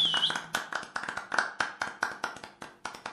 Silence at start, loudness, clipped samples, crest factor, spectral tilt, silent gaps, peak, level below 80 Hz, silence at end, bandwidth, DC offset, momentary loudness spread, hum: 0 s; -32 LUFS; under 0.1%; 26 dB; -0.5 dB/octave; none; -8 dBFS; -70 dBFS; 0 s; 14.5 kHz; under 0.1%; 15 LU; none